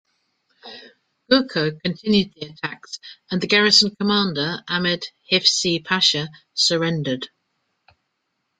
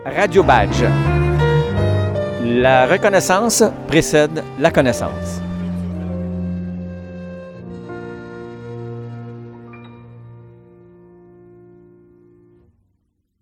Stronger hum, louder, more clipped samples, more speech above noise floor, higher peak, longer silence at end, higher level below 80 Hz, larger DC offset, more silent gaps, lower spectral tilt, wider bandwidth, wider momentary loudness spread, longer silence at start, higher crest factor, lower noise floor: neither; second, -19 LUFS vs -16 LUFS; neither; about the same, 54 dB vs 52 dB; about the same, 0 dBFS vs 0 dBFS; second, 1.35 s vs 2.9 s; second, -60 dBFS vs -34 dBFS; neither; neither; second, -3.5 dB/octave vs -5.5 dB/octave; second, 9.4 kHz vs 17.5 kHz; about the same, 18 LU vs 20 LU; first, 0.65 s vs 0 s; about the same, 22 dB vs 18 dB; first, -75 dBFS vs -67 dBFS